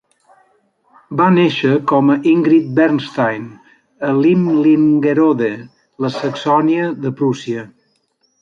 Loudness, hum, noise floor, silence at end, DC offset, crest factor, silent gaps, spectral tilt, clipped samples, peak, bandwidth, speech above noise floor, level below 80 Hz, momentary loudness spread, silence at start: -15 LUFS; none; -63 dBFS; 0.75 s; under 0.1%; 14 dB; none; -7.5 dB/octave; under 0.1%; -2 dBFS; 7.4 kHz; 49 dB; -62 dBFS; 12 LU; 1.1 s